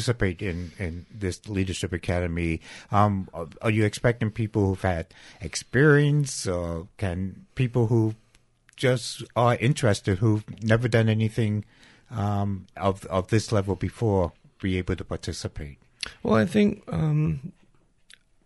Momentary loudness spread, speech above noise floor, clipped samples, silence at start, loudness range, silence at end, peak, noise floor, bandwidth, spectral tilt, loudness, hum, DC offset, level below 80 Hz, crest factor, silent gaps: 12 LU; 36 dB; under 0.1%; 0 s; 3 LU; 0.95 s; -8 dBFS; -60 dBFS; 11.5 kHz; -6.5 dB/octave; -26 LUFS; none; under 0.1%; -46 dBFS; 18 dB; none